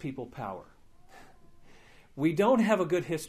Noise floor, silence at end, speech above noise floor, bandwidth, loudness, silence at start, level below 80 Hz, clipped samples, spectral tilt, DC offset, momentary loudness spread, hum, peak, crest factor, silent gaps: -54 dBFS; 0 s; 26 dB; 15.5 kHz; -28 LUFS; 0 s; -62 dBFS; under 0.1%; -6.5 dB/octave; under 0.1%; 18 LU; none; -12 dBFS; 20 dB; none